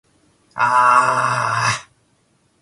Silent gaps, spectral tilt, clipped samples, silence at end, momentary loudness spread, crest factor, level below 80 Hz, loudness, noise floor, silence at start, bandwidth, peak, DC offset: none; -3 dB/octave; under 0.1%; 0.8 s; 11 LU; 18 dB; -58 dBFS; -16 LUFS; -61 dBFS; 0.55 s; 11.5 kHz; -2 dBFS; under 0.1%